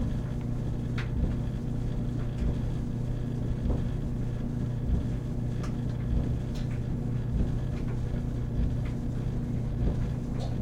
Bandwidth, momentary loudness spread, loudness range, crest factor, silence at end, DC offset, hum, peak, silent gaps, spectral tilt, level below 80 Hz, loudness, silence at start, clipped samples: 9 kHz; 2 LU; 1 LU; 14 dB; 0 s; under 0.1%; none; -14 dBFS; none; -8.5 dB/octave; -34 dBFS; -32 LUFS; 0 s; under 0.1%